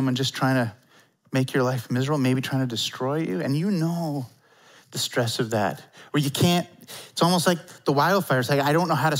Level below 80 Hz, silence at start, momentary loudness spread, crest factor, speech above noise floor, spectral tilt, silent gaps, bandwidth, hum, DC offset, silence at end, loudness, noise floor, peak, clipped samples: -68 dBFS; 0 s; 9 LU; 18 dB; 31 dB; -5 dB/octave; none; 16 kHz; none; under 0.1%; 0 s; -24 LUFS; -54 dBFS; -6 dBFS; under 0.1%